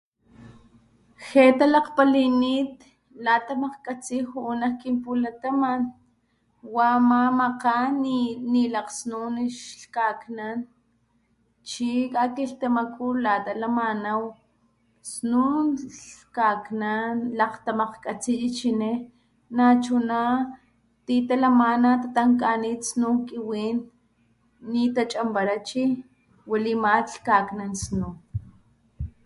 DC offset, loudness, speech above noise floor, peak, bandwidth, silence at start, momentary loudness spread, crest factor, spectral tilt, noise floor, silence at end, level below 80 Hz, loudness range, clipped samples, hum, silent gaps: under 0.1%; -24 LUFS; 44 dB; -4 dBFS; 11.5 kHz; 0.4 s; 13 LU; 20 dB; -5 dB/octave; -67 dBFS; 0.15 s; -54 dBFS; 6 LU; under 0.1%; none; none